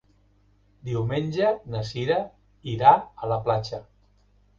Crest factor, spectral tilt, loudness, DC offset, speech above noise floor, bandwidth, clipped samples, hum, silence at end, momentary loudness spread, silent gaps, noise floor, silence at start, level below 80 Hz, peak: 22 dB; -7 dB/octave; -24 LUFS; under 0.1%; 38 dB; 7.4 kHz; under 0.1%; 50 Hz at -50 dBFS; 0.75 s; 20 LU; none; -61 dBFS; 0.85 s; -54 dBFS; -4 dBFS